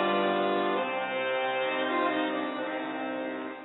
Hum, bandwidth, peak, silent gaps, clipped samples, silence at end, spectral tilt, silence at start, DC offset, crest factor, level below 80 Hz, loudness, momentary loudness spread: none; 4.1 kHz; -16 dBFS; none; under 0.1%; 0 s; -8.5 dB/octave; 0 s; under 0.1%; 14 dB; -86 dBFS; -29 LUFS; 7 LU